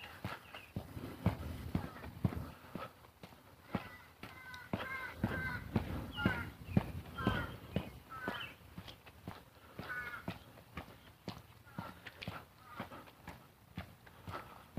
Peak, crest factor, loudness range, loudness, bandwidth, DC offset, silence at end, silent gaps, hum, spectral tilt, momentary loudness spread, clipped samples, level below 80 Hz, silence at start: -18 dBFS; 26 dB; 11 LU; -44 LUFS; 15.5 kHz; under 0.1%; 0 s; none; none; -6.5 dB/octave; 16 LU; under 0.1%; -56 dBFS; 0 s